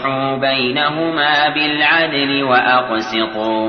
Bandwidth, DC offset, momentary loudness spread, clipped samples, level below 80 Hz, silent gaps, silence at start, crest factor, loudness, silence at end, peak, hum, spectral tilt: 6.6 kHz; under 0.1%; 6 LU; under 0.1%; -54 dBFS; none; 0 s; 14 dB; -15 LUFS; 0 s; -2 dBFS; none; -5 dB/octave